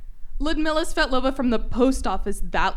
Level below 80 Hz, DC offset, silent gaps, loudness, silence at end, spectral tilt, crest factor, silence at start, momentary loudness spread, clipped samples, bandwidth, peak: -28 dBFS; under 0.1%; none; -24 LUFS; 0 s; -4.5 dB/octave; 14 dB; 0 s; 7 LU; under 0.1%; 13 kHz; -6 dBFS